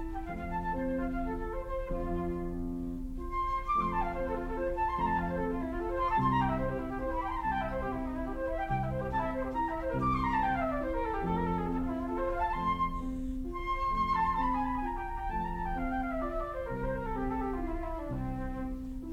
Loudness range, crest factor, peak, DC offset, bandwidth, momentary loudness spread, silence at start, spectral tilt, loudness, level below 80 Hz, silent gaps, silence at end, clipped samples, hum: 3 LU; 16 dB; -18 dBFS; under 0.1%; 14.5 kHz; 8 LU; 0 s; -8 dB/octave; -34 LUFS; -40 dBFS; none; 0 s; under 0.1%; none